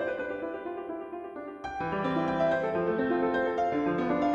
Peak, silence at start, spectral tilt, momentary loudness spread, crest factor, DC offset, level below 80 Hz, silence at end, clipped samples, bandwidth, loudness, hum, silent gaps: -16 dBFS; 0 s; -7.5 dB/octave; 11 LU; 14 dB; under 0.1%; -58 dBFS; 0 s; under 0.1%; 7.8 kHz; -30 LUFS; none; none